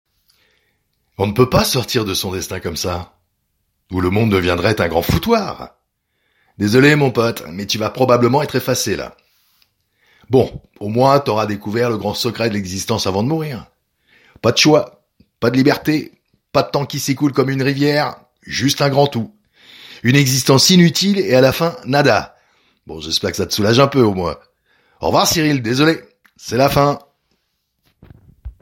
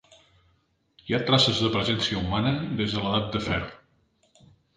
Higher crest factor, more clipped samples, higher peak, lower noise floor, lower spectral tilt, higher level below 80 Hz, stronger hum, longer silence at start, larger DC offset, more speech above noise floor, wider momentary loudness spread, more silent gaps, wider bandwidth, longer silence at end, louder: about the same, 18 dB vs 20 dB; neither; first, 0 dBFS vs -8 dBFS; about the same, -69 dBFS vs -68 dBFS; about the same, -5 dB/octave vs -5 dB/octave; about the same, -44 dBFS vs -48 dBFS; neither; first, 1.2 s vs 1.05 s; neither; first, 54 dB vs 43 dB; first, 13 LU vs 9 LU; neither; first, 16.5 kHz vs 9.6 kHz; second, 0.1 s vs 1 s; first, -16 LUFS vs -25 LUFS